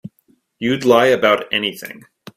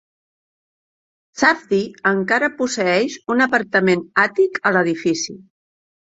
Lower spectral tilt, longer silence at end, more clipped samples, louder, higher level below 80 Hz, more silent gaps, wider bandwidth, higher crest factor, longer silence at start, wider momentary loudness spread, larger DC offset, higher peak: about the same, -4.5 dB/octave vs -4.5 dB/octave; second, 0.45 s vs 0.75 s; neither; about the same, -16 LUFS vs -18 LUFS; first, -58 dBFS vs -64 dBFS; neither; first, 16 kHz vs 8 kHz; about the same, 18 dB vs 18 dB; second, 0.05 s vs 1.35 s; first, 16 LU vs 5 LU; neither; about the same, 0 dBFS vs -2 dBFS